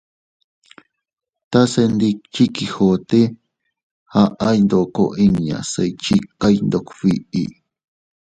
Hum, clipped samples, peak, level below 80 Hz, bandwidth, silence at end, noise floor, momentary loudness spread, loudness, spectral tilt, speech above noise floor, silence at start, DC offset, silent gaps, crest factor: none; under 0.1%; 0 dBFS; -48 dBFS; 9.2 kHz; 0.8 s; -50 dBFS; 6 LU; -18 LUFS; -6.5 dB/octave; 33 dB; 1.5 s; under 0.1%; 3.83-4.06 s; 18 dB